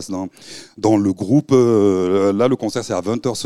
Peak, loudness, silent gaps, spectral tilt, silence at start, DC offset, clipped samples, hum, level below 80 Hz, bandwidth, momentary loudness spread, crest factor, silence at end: -2 dBFS; -17 LUFS; none; -6.5 dB/octave; 0 s; 0.3%; under 0.1%; none; -58 dBFS; 13 kHz; 14 LU; 14 dB; 0 s